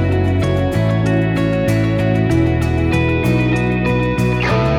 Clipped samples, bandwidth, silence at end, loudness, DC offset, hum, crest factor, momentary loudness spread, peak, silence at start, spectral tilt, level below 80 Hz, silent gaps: under 0.1%; 14 kHz; 0 s; -16 LUFS; under 0.1%; none; 12 dB; 1 LU; -4 dBFS; 0 s; -7.5 dB/octave; -30 dBFS; none